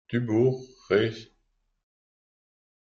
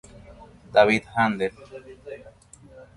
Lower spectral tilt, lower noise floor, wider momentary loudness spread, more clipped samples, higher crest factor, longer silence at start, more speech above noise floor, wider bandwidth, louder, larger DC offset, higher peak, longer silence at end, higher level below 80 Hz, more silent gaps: first, -7.5 dB/octave vs -5.5 dB/octave; first, -73 dBFS vs -48 dBFS; second, 12 LU vs 24 LU; neither; about the same, 20 dB vs 22 dB; second, 0.1 s vs 0.3 s; first, 48 dB vs 25 dB; second, 7 kHz vs 11.5 kHz; second, -26 LUFS vs -22 LUFS; neither; second, -10 dBFS vs -4 dBFS; first, 1.6 s vs 0.15 s; second, -64 dBFS vs -54 dBFS; neither